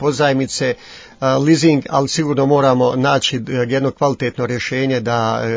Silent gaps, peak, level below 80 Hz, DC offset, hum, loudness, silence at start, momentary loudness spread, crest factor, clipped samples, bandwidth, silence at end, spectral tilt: none; 0 dBFS; -50 dBFS; under 0.1%; none; -16 LUFS; 0 s; 7 LU; 16 dB; under 0.1%; 8 kHz; 0 s; -5.5 dB/octave